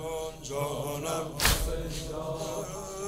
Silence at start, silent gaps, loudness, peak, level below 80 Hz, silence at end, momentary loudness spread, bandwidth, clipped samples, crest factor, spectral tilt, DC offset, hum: 0 s; none; -32 LUFS; -8 dBFS; -40 dBFS; 0 s; 10 LU; 16 kHz; under 0.1%; 24 dB; -3 dB/octave; under 0.1%; none